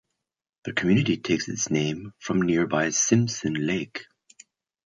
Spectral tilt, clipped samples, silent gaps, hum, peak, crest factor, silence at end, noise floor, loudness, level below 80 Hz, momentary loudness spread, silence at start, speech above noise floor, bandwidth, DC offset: -4.5 dB/octave; under 0.1%; none; none; -6 dBFS; 20 dB; 0.85 s; -56 dBFS; -24 LUFS; -58 dBFS; 11 LU; 0.65 s; 32 dB; 9.6 kHz; under 0.1%